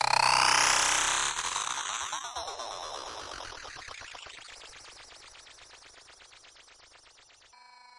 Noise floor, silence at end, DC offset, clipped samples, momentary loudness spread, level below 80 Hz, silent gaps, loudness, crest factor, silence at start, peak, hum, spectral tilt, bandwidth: -58 dBFS; 1.6 s; under 0.1%; under 0.1%; 26 LU; -60 dBFS; none; -27 LUFS; 24 dB; 0 s; -8 dBFS; none; 1 dB/octave; 11.5 kHz